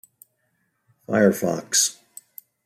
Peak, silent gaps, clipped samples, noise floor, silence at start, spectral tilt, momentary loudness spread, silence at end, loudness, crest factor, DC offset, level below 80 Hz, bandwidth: -4 dBFS; none; under 0.1%; -71 dBFS; 1.1 s; -3 dB/octave; 23 LU; 0.75 s; -21 LUFS; 20 dB; under 0.1%; -70 dBFS; 16 kHz